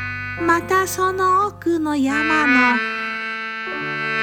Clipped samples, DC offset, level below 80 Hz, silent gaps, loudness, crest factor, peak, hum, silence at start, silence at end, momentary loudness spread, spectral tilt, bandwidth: under 0.1%; under 0.1%; -52 dBFS; none; -19 LUFS; 18 dB; -2 dBFS; none; 0 s; 0 s; 10 LU; -4 dB/octave; 18 kHz